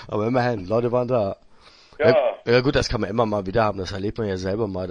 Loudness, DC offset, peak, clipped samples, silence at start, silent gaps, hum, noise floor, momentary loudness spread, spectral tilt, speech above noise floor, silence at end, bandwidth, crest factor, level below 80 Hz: -22 LUFS; under 0.1%; -2 dBFS; under 0.1%; 0 s; none; none; -50 dBFS; 8 LU; -6.5 dB/octave; 28 dB; 0 s; 10 kHz; 20 dB; -42 dBFS